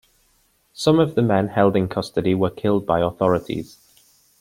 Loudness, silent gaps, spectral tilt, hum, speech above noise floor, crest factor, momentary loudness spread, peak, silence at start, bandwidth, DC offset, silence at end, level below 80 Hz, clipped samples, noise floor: -20 LUFS; none; -7 dB/octave; none; 43 dB; 18 dB; 6 LU; -2 dBFS; 0.8 s; 16.5 kHz; under 0.1%; 0.75 s; -52 dBFS; under 0.1%; -62 dBFS